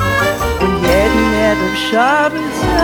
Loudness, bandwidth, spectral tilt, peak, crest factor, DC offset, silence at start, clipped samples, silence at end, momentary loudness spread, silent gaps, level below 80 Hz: -13 LUFS; over 20 kHz; -5 dB/octave; 0 dBFS; 12 dB; under 0.1%; 0 s; under 0.1%; 0 s; 4 LU; none; -26 dBFS